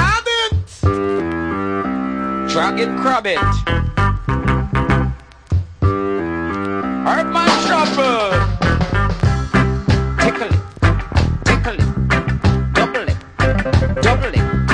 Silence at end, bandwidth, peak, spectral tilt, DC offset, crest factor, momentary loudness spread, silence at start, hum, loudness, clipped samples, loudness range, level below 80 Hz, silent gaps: 0 s; 10.5 kHz; 0 dBFS; -6 dB/octave; under 0.1%; 16 dB; 6 LU; 0 s; none; -17 LUFS; under 0.1%; 2 LU; -24 dBFS; none